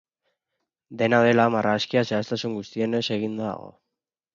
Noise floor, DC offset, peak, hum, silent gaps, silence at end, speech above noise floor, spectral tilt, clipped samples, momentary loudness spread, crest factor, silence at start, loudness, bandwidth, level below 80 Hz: -85 dBFS; under 0.1%; -6 dBFS; none; none; 0.65 s; 62 dB; -6 dB/octave; under 0.1%; 12 LU; 18 dB; 0.9 s; -23 LUFS; 7.4 kHz; -66 dBFS